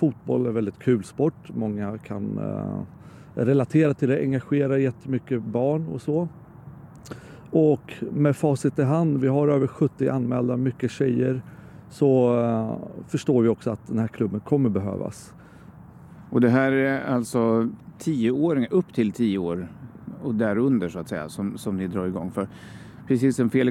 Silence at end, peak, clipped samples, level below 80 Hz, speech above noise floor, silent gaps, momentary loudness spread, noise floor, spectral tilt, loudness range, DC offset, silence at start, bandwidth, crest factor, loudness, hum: 0 s; -6 dBFS; under 0.1%; -60 dBFS; 23 dB; none; 13 LU; -46 dBFS; -8 dB/octave; 4 LU; under 0.1%; 0 s; 13.5 kHz; 18 dB; -24 LUFS; none